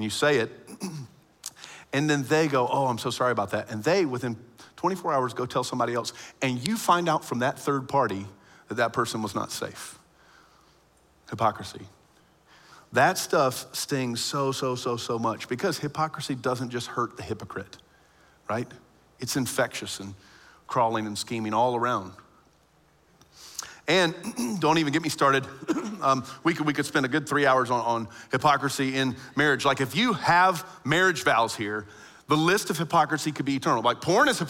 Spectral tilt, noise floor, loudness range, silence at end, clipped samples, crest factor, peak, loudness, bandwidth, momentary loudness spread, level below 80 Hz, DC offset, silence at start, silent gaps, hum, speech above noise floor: -4.5 dB/octave; -62 dBFS; 8 LU; 0 s; under 0.1%; 22 dB; -4 dBFS; -26 LUFS; 16.5 kHz; 14 LU; -66 dBFS; under 0.1%; 0 s; none; none; 36 dB